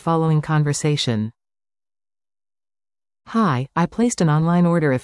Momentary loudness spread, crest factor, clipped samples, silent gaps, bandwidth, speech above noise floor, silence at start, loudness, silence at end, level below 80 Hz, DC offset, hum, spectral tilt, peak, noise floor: 6 LU; 14 dB; under 0.1%; none; 12 kHz; over 72 dB; 0.05 s; -19 LUFS; 0 s; -54 dBFS; under 0.1%; none; -6 dB/octave; -6 dBFS; under -90 dBFS